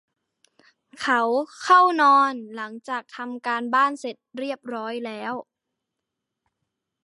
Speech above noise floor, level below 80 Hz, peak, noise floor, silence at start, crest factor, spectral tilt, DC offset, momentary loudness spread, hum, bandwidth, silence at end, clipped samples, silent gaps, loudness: 61 dB; -80 dBFS; -4 dBFS; -83 dBFS; 0.95 s; 20 dB; -3 dB/octave; under 0.1%; 18 LU; none; 11.5 kHz; 1.6 s; under 0.1%; none; -22 LUFS